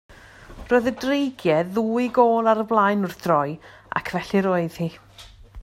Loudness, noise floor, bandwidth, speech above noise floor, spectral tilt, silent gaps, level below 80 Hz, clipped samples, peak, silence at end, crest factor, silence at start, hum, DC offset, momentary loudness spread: -22 LUFS; -43 dBFS; 16 kHz; 22 dB; -6.5 dB/octave; none; -52 dBFS; under 0.1%; -4 dBFS; 0 s; 18 dB; 0.1 s; none; under 0.1%; 11 LU